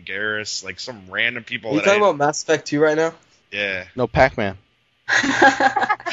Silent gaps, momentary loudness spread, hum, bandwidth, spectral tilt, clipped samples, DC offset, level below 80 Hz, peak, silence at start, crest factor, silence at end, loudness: none; 12 LU; none; 8.2 kHz; -3.5 dB/octave; under 0.1%; under 0.1%; -46 dBFS; -2 dBFS; 0.05 s; 18 dB; 0 s; -19 LUFS